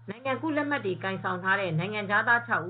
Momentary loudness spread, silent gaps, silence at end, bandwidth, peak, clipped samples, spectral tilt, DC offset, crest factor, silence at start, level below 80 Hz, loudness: 8 LU; none; 0 s; 4.7 kHz; -10 dBFS; under 0.1%; -3.5 dB/octave; under 0.1%; 18 dB; 0 s; -74 dBFS; -28 LUFS